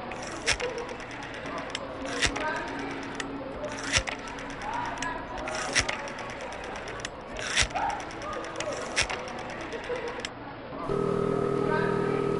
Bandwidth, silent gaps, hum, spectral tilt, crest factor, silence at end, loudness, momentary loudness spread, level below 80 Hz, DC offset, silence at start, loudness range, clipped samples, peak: 11.5 kHz; none; none; -3 dB/octave; 24 dB; 0 s; -31 LUFS; 10 LU; -48 dBFS; under 0.1%; 0 s; 2 LU; under 0.1%; -8 dBFS